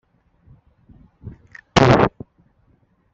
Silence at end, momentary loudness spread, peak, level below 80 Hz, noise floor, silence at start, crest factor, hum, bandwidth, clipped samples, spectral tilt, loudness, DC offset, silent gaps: 1.05 s; 28 LU; 0 dBFS; -42 dBFS; -60 dBFS; 1.25 s; 22 dB; none; 8 kHz; under 0.1%; -5 dB/octave; -16 LUFS; under 0.1%; none